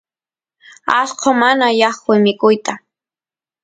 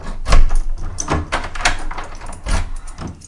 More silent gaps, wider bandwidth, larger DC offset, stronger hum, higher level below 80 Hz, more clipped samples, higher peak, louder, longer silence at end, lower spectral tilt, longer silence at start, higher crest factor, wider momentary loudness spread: neither; second, 9.4 kHz vs 11 kHz; neither; neither; second, -64 dBFS vs -18 dBFS; neither; about the same, 0 dBFS vs 0 dBFS; first, -14 LUFS vs -22 LUFS; first, 0.85 s vs 0 s; about the same, -4 dB/octave vs -3.5 dB/octave; first, 0.85 s vs 0 s; about the same, 16 dB vs 16 dB; about the same, 11 LU vs 13 LU